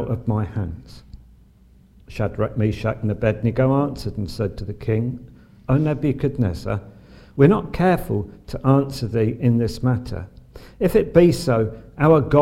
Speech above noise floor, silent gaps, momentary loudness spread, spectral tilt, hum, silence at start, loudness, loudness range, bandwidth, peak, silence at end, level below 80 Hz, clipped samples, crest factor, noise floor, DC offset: 31 dB; none; 13 LU; -8 dB/octave; none; 0 s; -21 LUFS; 4 LU; 16 kHz; -2 dBFS; 0 s; -40 dBFS; under 0.1%; 20 dB; -51 dBFS; under 0.1%